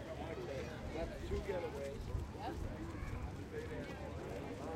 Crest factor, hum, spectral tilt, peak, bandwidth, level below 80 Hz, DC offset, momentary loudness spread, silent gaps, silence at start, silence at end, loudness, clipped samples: 14 dB; none; -6.5 dB/octave; -30 dBFS; 16 kHz; -50 dBFS; under 0.1%; 4 LU; none; 0 s; 0 s; -45 LUFS; under 0.1%